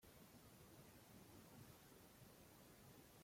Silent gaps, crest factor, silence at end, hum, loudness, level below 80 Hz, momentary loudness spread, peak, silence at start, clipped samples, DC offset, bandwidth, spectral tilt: none; 16 dB; 0 s; none; -65 LUFS; -80 dBFS; 2 LU; -50 dBFS; 0 s; under 0.1%; under 0.1%; 16.5 kHz; -4.5 dB/octave